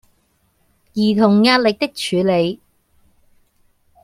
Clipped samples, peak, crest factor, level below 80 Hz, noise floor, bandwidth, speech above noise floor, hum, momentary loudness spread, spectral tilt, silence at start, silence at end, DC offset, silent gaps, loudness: under 0.1%; -2 dBFS; 18 dB; -58 dBFS; -62 dBFS; 14.5 kHz; 47 dB; none; 11 LU; -5.5 dB/octave; 0.95 s; 1.5 s; under 0.1%; none; -16 LUFS